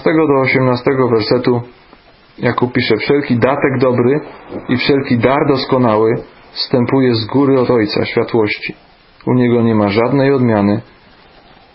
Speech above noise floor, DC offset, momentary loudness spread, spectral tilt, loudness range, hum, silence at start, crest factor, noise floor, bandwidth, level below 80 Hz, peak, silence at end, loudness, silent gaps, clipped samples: 31 dB; under 0.1%; 8 LU; -11.5 dB/octave; 2 LU; none; 0 s; 14 dB; -44 dBFS; 5.8 kHz; -46 dBFS; 0 dBFS; 0.95 s; -13 LUFS; none; under 0.1%